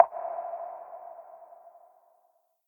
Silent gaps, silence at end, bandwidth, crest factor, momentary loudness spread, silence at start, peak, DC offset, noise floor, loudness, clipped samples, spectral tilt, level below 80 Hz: none; 1 s; 19 kHz; 30 dB; 19 LU; 0 s; -2 dBFS; under 0.1%; -70 dBFS; -34 LUFS; under 0.1%; -6 dB/octave; -86 dBFS